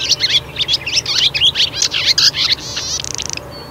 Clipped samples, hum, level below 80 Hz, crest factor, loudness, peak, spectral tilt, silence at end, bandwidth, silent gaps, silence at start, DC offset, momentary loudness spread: under 0.1%; none; -42 dBFS; 16 dB; -13 LUFS; 0 dBFS; 0 dB/octave; 0 s; 16 kHz; none; 0 s; under 0.1%; 10 LU